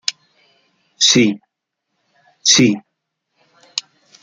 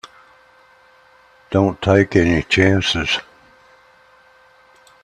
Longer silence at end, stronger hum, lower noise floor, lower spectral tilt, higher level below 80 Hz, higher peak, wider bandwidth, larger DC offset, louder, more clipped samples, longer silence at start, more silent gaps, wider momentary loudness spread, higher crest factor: second, 0.45 s vs 1.8 s; neither; first, -77 dBFS vs -51 dBFS; second, -2.5 dB/octave vs -5.5 dB/octave; second, -58 dBFS vs -44 dBFS; about the same, 0 dBFS vs 0 dBFS; about the same, 11 kHz vs 10 kHz; neither; about the same, -15 LUFS vs -16 LUFS; neither; second, 0.1 s vs 1.5 s; neither; first, 15 LU vs 7 LU; about the same, 20 dB vs 20 dB